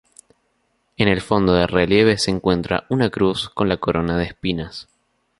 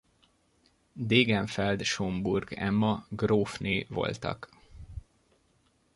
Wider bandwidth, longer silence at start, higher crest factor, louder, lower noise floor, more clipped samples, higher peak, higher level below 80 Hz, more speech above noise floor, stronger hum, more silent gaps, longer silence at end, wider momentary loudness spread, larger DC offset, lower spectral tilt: about the same, 11.5 kHz vs 11.5 kHz; about the same, 1 s vs 0.95 s; about the same, 18 dB vs 22 dB; first, -19 LUFS vs -29 LUFS; about the same, -67 dBFS vs -69 dBFS; neither; first, -2 dBFS vs -10 dBFS; first, -40 dBFS vs -54 dBFS; first, 49 dB vs 40 dB; neither; neither; second, 0.6 s vs 0.95 s; second, 9 LU vs 22 LU; neither; about the same, -5.5 dB/octave vs -5.5 dB/octave